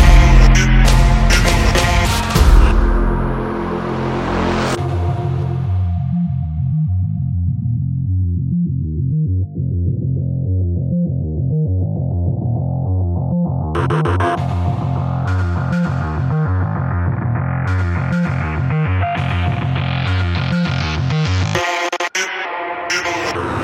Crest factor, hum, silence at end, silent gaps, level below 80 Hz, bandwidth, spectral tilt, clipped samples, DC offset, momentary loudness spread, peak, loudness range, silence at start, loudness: 16 dB; none; 0 s; none; -20 dBFS; 15 kHz; -6 dB/octave; under 0.1%; under 0.1%; 7 LU; 0 dBFS; 4 LU; 0 s; -17 LUFS